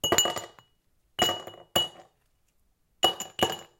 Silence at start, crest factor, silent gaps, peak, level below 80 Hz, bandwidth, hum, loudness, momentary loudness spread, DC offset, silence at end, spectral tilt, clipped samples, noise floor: 0.05 s; 28 dB; none; -4 dBFS; -60 dBFS; 17 kHz; none; -27 LUFS; 13 LU; under 0.1%; 0.15 s; -1.5 dB/octave; under 0.1%; -70 dBFS